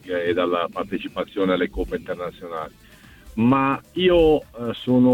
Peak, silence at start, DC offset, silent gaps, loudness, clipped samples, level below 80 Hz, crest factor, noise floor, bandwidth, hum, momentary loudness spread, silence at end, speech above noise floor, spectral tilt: -4 dBFS; 0.05 s; under 0.1%; none; -22 LUFS; under 0.1%; -42 dBFS; 16 dB; -46 dBFS; 15.5 kHz; none; 14 LU; 0 s; 25 dB; -7.5 dB/octave